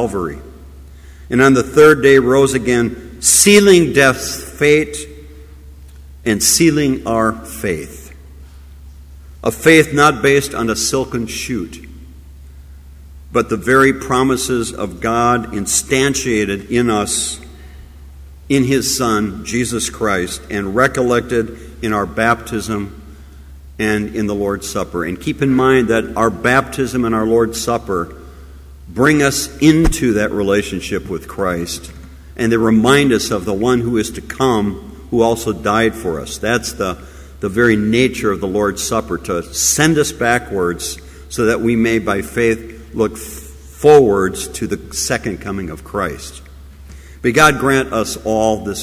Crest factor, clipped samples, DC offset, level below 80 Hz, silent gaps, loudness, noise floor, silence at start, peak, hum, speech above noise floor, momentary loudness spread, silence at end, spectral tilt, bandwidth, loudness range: 16 dB; under 0.1%; under 0.1%; -34 dBFS; none; -15 LUFS; -37 dBFS; 0 s; 0 dBFS; none; 22 dB; 13 LU; 0 s; -4 dB/octave; 16 kHz; 6 LU